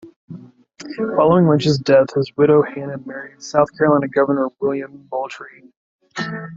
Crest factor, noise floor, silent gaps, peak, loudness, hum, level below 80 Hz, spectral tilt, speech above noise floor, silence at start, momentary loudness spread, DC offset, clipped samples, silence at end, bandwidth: 16 dB; -40 dBFS; 0.16-0.28 s, 5.77-5.99 s; -2 dBFS; -17 LUFS; none; -58 dBFS; -7 dB/octave; 23 dB; 0.05 s; 20 LU; under 0.1%; under 0.1%; 0 s; 7.8 kHz